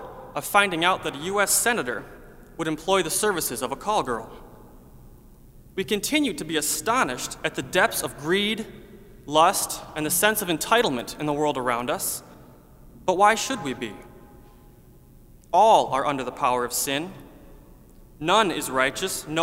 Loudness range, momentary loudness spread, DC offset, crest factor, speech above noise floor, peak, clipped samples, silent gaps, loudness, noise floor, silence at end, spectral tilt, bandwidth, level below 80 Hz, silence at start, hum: 4 LU; 12 LU; under 0.1%; 22 dB; 27 dB; -2 dBFS; under 0.1%; none; -23 LUFS; -50 dBFS; 0 s; -2.5 dB/octave; 16 kHz; -52 dBFS; 0 s; none